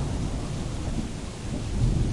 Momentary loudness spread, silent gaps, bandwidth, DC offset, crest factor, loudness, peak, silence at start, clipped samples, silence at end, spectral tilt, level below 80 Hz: 8 LU; none; 11.5 kHz; under 0.1%; 16 dB; -31 LUFS; -12 dBFS; 0 s; under 0.1%; 0 s; -6.5 dB/octave; -32 dBFS